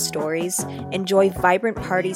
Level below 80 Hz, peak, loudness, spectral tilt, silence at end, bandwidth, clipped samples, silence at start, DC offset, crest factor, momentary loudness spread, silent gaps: -48 dBFS; -2 dBFS; -21 LUFS; -4 dB/octave; 0 s; 16.5 kHz; under 0.1%; 0 s; under 0.1%; 18 dB; 8 LU; none